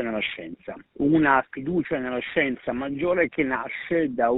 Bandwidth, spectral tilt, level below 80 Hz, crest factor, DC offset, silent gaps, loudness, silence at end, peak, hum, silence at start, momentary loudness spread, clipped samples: 4.1 kHz; -4 dB/octave; -54 dBFS; 20 dB; under 0.1%; none; -24 LUFS; 0 s; -4 dBFS; none; 0 s; 10 LU; under 0.1%